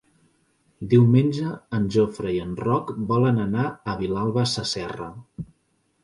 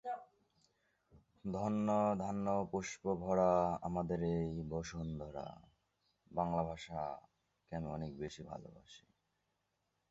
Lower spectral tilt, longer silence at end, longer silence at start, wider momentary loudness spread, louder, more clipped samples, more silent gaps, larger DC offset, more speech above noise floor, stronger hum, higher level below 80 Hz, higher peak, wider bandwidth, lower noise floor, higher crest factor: about the same, -7 dB/octave vs -7 dB/octave; second, 0.6 s vs 1.1 s; first, 0.8 s vs 0.05 s; first, 19 LU vs 15 LU; first, -23 LUFS vs -39 LUFS; neither; neither; neither; about the same, 46 dB vs 46 dB; neither; first, -52 dBFS vs -60 dBFS; first, -6 dBFS vs -20 dBFS; first, 11 kHz vs 8 kHz; second, -68 dBFS vs -84 dBFS; about the same, 18 dB vs 20 dB